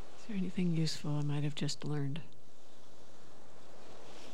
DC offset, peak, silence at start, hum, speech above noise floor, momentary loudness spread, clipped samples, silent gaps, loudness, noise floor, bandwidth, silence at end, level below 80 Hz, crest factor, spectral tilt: 2%; -22 dBFS; 0 s; none; 26 dB; 24 LU; under 0.1%; none; -37 LUFS; -62 dBFS; 12.5 kHz; 0 s; -76 dBFS; 14 dB; -6 dB/octave